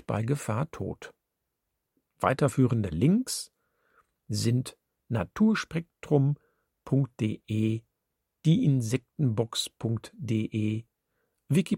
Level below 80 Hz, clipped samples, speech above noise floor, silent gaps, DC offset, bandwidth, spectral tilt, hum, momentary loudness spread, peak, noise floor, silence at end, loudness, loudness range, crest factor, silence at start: -60 dBFS; under 0.1%; 56 dB; none; under 0.1%; 16 kHz; -6.5 dB/octave; none; 11 LU; -8 dBFS; -83 dBFS; 0 s; -29 LUFS; 1 LU; 22 dB; 0.1 s